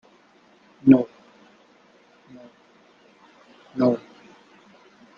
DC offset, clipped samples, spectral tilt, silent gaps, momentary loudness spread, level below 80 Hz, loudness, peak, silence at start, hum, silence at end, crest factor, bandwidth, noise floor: under 0.1%; under 0.1%; -9.5 dB/octave; none; 17 LU; -68 dBFS; -21 LUFS; -2 dBFS; 0.85 s; none; 1.2 s; 24 dB; 5.4 kHz; -57 dBFS